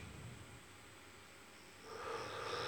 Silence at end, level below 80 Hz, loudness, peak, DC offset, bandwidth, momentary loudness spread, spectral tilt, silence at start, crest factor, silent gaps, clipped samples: 0 s; -70 dBFS; -50 LUFS; -32 dBFS; under 0.1%; over 20 kHz; 13 LU; -3.5 dB/octave; 0 s; 18 dB; none; under 0.1%